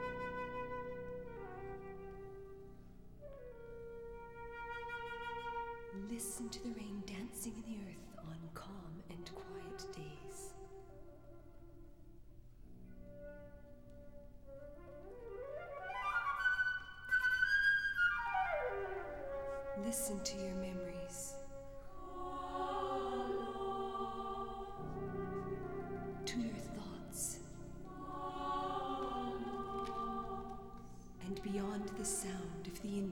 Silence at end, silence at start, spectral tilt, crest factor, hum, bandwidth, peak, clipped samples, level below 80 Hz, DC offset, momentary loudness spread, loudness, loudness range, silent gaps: 0 s; 0 s; -3.5 dB/octave; 20 dB; none; over 20 kHz; -24 dBFS; under 0.1%; -58 dBFS; 0.1%; 20 LU; -42 LUFS; 18 LU; none